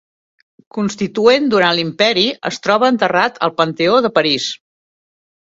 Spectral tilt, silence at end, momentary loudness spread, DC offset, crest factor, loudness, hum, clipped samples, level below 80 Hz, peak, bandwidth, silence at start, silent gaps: -4 dB/octave; 1.05 s; 9 LU; under 0.1%; 16 dB; -15 LUFS; none; under 0.1%; -58 dBFS; 0 dBFS; 7.8 kHz; 0.75 s; none